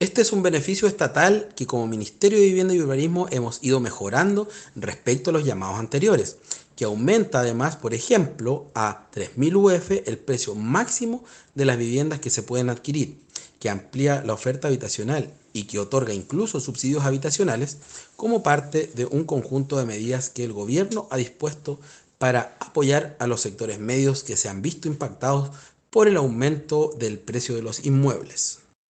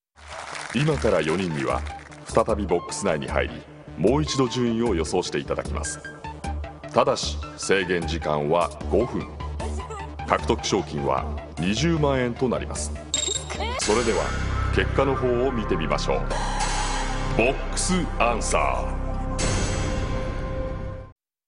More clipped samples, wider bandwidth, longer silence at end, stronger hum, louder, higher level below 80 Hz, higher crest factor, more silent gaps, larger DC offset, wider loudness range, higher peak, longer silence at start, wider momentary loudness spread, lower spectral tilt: neither; second, 9.4 kHz vs 11 kHz; about the same, 0.35 s vs 0.35 s; neither; about the same, -23 LUFS vs -25 LUFS; second, -62 dBFS vs -32 dBFS; about the same, 20 dB vs 24 dB; neither; neither; about the same, 4 LU vs 2 LU; about the same, -2 dBFS vs 0 dBFS; second, 0 s vs 0.2 s; about the same, 10 LU vs 11 LU; about the same, -5 dB/octave vs -4.5 dB/octave